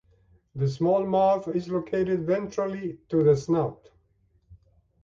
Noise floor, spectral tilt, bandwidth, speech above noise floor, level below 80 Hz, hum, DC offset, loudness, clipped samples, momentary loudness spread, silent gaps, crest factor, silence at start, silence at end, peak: -66 dBFS; -8 dB/octave; 7.6 kHz; 41 dB; -58 dBFS; none; under 0.1%; -26 LUFS; under 0.1%; 9 LU; none; 16 dB; 0.55 s; 0.5 s; -10 dBFS